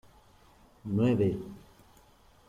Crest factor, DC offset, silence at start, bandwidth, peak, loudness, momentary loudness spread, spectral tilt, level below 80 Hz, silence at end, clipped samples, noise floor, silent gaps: 18 dB; under 0.1%; 0.85 s; 15 kHz; -14 dBFS; -29 LUFS; 20 LU; -9 dB/octave; -60 dBFS; 0.9 s; under 0.1%; -60 dBFS; none